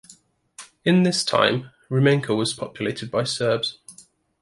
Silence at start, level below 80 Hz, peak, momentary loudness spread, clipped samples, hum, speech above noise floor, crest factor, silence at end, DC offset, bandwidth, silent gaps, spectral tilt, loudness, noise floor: 0.6 s; -62 dBFS; -4 dBFS; 10 LU; under 0.1%; none; 32 dB; 20 dB; 0.5 s; under 0.1%; 11.5 kHz; none; -5 dB/octave; -22 LUFS; -53 dBFS